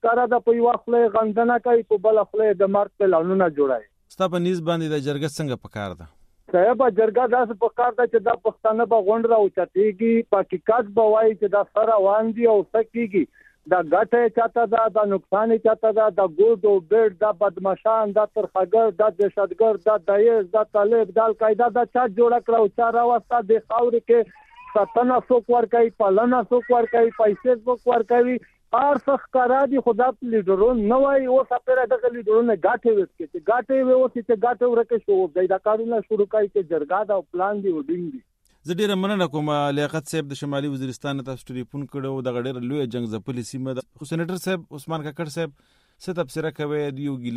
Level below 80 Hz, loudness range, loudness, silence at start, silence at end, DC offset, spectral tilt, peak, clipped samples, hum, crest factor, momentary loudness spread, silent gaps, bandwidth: -58 dBFS; 9 LU; -21 LUFS; 0.05 s; 0 s; under 0.1%; -6.5 dB/octave; -4 dBFS; under 0.1%; none; 16 dB; 11 LU; none; 12.5 kHz